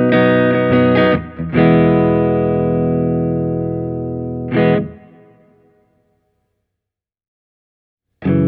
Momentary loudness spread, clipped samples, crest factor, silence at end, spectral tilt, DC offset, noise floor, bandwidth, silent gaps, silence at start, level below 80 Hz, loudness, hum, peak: 11 LU; under 0.1%; 14 dB; 0 s; -11 dB/octave; under 0.1%; -84 dBFS; 5 kHz; 7.28-7.97 s; 0 s; -42 dBFS; -15 LUFS; none; -2 dBFS